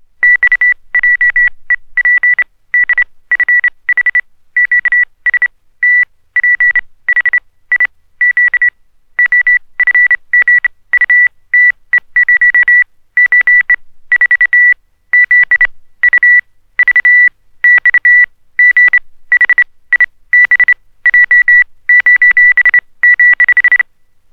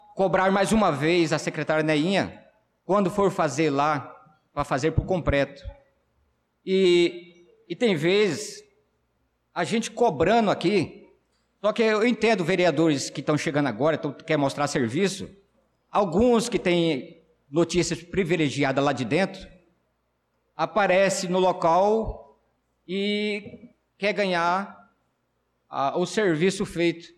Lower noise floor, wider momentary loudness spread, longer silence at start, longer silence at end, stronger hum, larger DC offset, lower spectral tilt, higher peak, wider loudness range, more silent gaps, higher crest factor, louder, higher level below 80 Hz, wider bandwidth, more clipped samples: second, -45 dBFS vs -73 dBFS; second, 8 LU vs 11 LU; about the same, 0.2 s vs 0.15 s; first, 0.5 s vs 0.1 s; neither; neither; second, -1 dB/octave vs -5 dB/octave; first, 0 dBFS vs -12 dBFS; about the same, 4 LU vs 3 LU; neither; about the same, 10 dB vs 12 dB; first, -7 LUFS vs -24 LUFS; about the same, -48 dBFS vs -48 dBFS; second, 4.2 kHz vs 13 kHz; neither